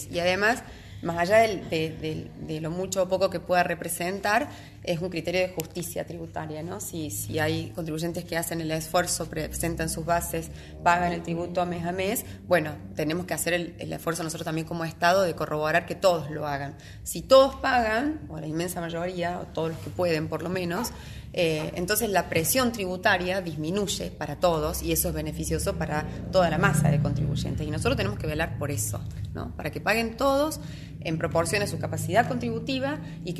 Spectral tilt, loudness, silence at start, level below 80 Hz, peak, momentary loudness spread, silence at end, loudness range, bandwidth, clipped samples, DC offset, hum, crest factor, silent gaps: -4.5 dB/octave; -27 LUFS; 0 s; -44 dBFS; -6 dBFS; 11 LU; 0 s; 4 LU; 13 kHz; under 0.1%; under 0.1%; none; 22 dB; none